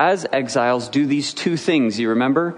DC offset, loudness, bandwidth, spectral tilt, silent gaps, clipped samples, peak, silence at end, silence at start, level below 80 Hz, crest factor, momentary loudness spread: under 0.1%; -19 LUFS; 10.5 kHz; -5 dB/octave; none; under 0.1%; -2 dBFS; 0 s; 0 s; -68 dBFS; 16 dB; 3 LU